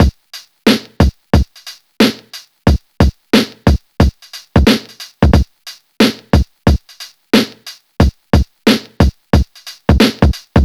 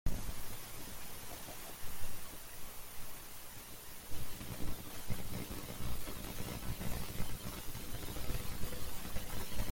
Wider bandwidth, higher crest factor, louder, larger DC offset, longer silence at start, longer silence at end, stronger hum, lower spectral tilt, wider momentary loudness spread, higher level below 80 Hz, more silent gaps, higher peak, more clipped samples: second, 15 kHz vs 17 kHz; about the same, 14 dB vs 16 dB; first, -14 LUFS vs -45 LUFS; neither; about the same, 0 s vs 0.05 s; about the same, 0 s vs 0 s; neither; first, -6 dB/octave vs -4 dB/octave; first, 21 LU vs 6 LU; first, -18 dBFS vs -46 dBFS; neither; first, 0 dBFS vs -20 dBFS; neither